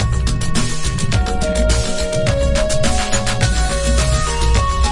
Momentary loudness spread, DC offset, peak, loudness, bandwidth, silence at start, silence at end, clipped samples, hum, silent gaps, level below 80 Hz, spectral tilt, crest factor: 3 LU; under 0.1%; -2 dBFS; -17 LUFS; 11.5 kHz; 0 s; 0 s; under 0.1%; none; none; -18 dBFS; -4.5 dB/octave; 12 dB